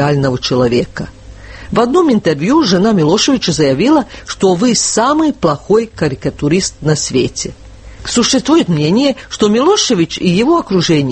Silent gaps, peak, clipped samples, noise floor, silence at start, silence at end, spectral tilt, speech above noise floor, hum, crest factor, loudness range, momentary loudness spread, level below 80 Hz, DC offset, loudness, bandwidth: none; 0 dBFS; under 0.1%; -32 dBFS; 0 s; 0 s; -4.5 dB/octave; 20 dB; none; 12 dB; 3 LU; 7 LU; -38 dBFS; under 0.1%; -12 LUFS; 8.8 kHz